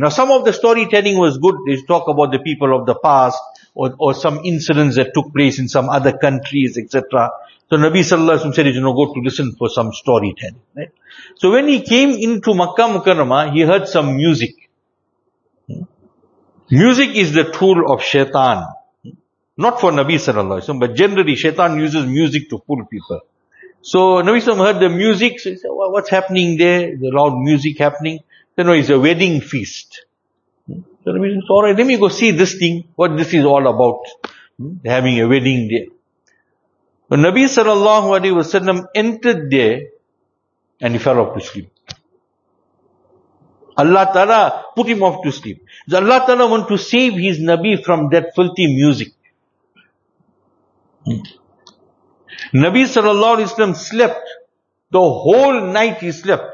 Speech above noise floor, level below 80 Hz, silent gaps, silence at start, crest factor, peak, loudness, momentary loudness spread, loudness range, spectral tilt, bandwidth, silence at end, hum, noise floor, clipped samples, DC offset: 55 dB; -58 dBFS; none; 0 s; 14 dB; 0 dBFS; -14 LUFS; 13 LU; 5 LU; -5.5 dB/octave; 7.4 kHz; 0 s; none; -69 dBFS; under 0.1%; under 0.1%